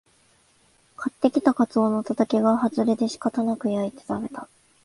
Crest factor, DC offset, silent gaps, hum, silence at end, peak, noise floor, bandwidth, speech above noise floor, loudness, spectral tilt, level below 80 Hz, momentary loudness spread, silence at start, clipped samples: 20 dB; under 0.1%; none; none; 0.4 s; -4 dBFS; -61 dBFS; 11.5 kHz; 38 dB; -24 LUFS; -6.5 dB/octave; -64 dBFS; 11 LU; 1 s; under 0.1%